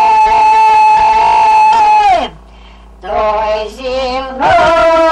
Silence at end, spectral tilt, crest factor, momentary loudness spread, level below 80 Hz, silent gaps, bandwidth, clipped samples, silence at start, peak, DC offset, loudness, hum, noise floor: 0 s; -3.5 dB/octave; 8 dB; 11 LU; -34 dBFS; none; 10 kHz; under 0.1%; 0 s; -2 dBFS; under 0.1%; -9 LUFS; none; -35 dBFS